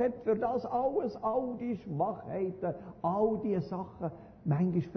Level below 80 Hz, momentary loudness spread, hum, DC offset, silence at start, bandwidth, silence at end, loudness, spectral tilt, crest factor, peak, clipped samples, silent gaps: -62 dBFS; 9 LU; none; under 0.1%; 0 s; 6.2 kHz; 0 s; -33 LUFS; -9 dB/octave; 14 dB; -18 dBFS; under 0.1%; none